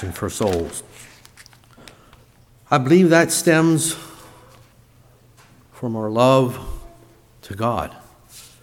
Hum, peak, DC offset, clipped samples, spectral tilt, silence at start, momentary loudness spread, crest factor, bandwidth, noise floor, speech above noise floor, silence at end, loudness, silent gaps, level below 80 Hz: none; -2 dBFS; under 0.1%; under 0.1%; -5 dB/octave; 0 s; 19 LU; 20 dB; 17 kHz; -52 dBFS; 34 dB; 0.2 s; -18 LUFS; none; -46 dBFS